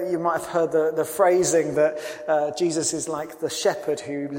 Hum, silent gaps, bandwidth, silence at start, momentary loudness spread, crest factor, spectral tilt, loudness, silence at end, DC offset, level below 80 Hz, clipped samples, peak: none; none; 16.5 kHz; 0 s; 9 LU; 18 dB; -4 dB/octave; -23 LUFS; 0 s; under 0.1%; -64 dBFS; under 0.1%; -6 dBFS